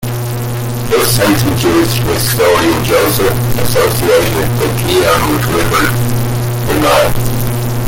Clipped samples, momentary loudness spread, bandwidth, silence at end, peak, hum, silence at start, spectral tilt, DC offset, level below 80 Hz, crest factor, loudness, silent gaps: under 0.1%; 6 LU; 17 kHz; 0 s; 0 dBFS; none; 0 s; -5 dB/octave; under 0.1%; -26 dBFS; 12 dB; -12 LUFS; none